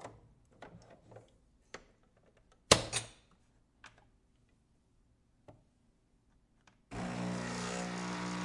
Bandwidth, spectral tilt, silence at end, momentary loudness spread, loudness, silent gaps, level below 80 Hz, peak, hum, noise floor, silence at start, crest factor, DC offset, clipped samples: 11.5 kHz; -3 dB/octave; 0 s; 28 LU; -34 LUFS; none; -62 dBFS; -6 dBFS; none; -72 dBFS; 0 s; 34 dB; under 0.1%; under 0.1%